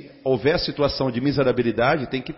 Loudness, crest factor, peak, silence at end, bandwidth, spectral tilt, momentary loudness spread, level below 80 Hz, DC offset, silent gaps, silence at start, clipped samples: -22 LUFS; 14 dB; -8 dBFS; 0 s; 5.8 kHz; -9.5 dB/octave; 3 LU; -44 dBFS; under 0.1%; none; 0 s; under 0.1%